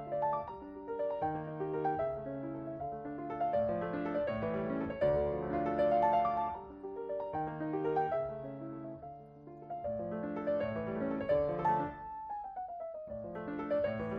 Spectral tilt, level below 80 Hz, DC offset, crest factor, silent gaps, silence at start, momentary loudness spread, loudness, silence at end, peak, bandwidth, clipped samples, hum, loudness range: -6.5 dB/octave; -60 dBFS; under 0.1%; 18 dB; none; 0 s; 13 LU; -36 LUFS; 0 s; -18 dBFS; 5.2 kHz; under 0.1%; none; 5 LU